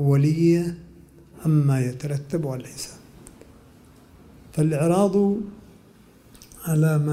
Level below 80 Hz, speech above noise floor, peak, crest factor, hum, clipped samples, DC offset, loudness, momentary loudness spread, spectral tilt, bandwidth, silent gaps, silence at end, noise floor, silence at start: -54 dBFS; 31 dB; -8 dBFS; 16 dB; none; under 0.1%; under 0.1%; -22 LUFS; 16 LU; -7.5 dB/octave; 15.5 kHz; none; 0 s; -52 dBFS; 0 s